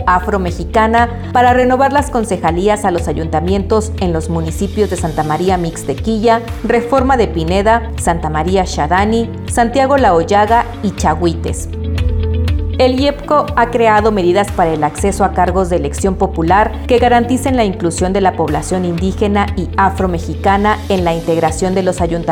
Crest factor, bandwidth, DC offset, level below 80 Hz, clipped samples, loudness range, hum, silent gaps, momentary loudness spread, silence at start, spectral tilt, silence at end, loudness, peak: 12 dB; 16.5 kHz; under 0.1%; -26 dBFS; under 0.1%; 2 LU; none; none; 6 LU; 0 s; -6 dB/octave; 0 s; -14 LUFS; 0 dBFS